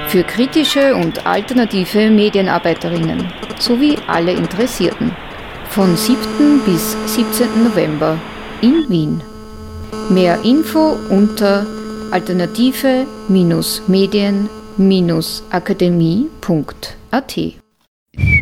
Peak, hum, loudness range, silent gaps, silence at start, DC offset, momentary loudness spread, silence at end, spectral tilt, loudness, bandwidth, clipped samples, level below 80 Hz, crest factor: 0 dBFS; none; 2 LU; 17.88-18.06 s; 0 s; under 0.1%; 11 LU; 0 s; -5.5 dB/octave; -15 LUFS; 19 kHz; under 0.1%; -38 dBFS; 14 dB